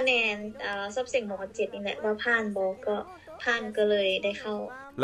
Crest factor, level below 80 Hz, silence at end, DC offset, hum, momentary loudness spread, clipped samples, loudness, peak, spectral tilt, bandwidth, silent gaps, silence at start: 18 dB; -64 dBFS; 0 s; under 0.1%; none; 10 LU; under 0.1%; -29 LUFS; -12 dBFS; -3.5 dB/octave; 12 kHz; none; 0 s